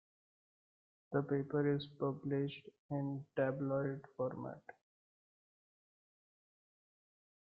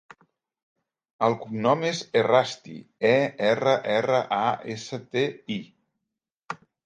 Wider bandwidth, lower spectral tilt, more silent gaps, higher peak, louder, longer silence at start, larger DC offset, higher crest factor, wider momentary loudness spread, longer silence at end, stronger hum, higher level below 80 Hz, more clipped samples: second, 5 kHz vs 9.4 kHz; first, -7 dB/octave vs -5 dB/octave; about the same, 2.79-2.89 s vs 6.34-6.40 s; second, -22 dBFS vs -6 dBFS; second, -40 LUFS vs -25 LUFS; about the same, 1.1 s vs 1.2 s; neither; about the same, 20 dB vs 20 dB; second, 10 LU vs 13 LU; first, 2.7 s vs 0.3 s; neither; second, -80 dBFS vs -72 dBFS; neither